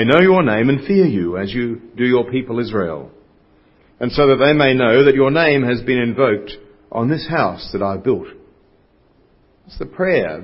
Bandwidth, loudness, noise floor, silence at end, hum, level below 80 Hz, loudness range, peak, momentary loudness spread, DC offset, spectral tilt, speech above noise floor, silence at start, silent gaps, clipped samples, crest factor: 5.8 kHz; -16 LUFS; -54 dBFS; 0 s; none; -46 dBFS; 8 LU; 0 dBFS; 13 LU; under 0.1%; -9 dB/octave; 39 dB; 0 s; none; under 0.1%; 16 dB